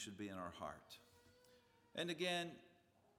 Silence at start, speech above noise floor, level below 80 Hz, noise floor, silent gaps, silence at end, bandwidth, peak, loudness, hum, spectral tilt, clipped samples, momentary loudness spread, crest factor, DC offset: 0 s; 25 dB; -80 dBFS; -72 dBFS; none; 0.45 s; 17 kHz; -28 dBFS; -46 LUFS; none; -3.5 dB/octave; under 0.1%; 20 LU; 22 dB; under 0.1%